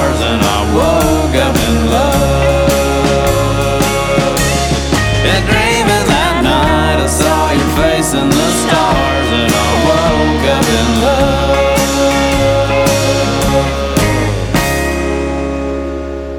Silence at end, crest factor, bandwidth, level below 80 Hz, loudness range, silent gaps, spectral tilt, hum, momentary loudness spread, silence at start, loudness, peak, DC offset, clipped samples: 0 s; 12 dB; 18.5 kHz; -20 dBFS; 1 LU; none; -4.5 dB/octave; none; 3 LU; 0 s; -12 LUFS; 0 dBFS; under 0.1%; under 0.1%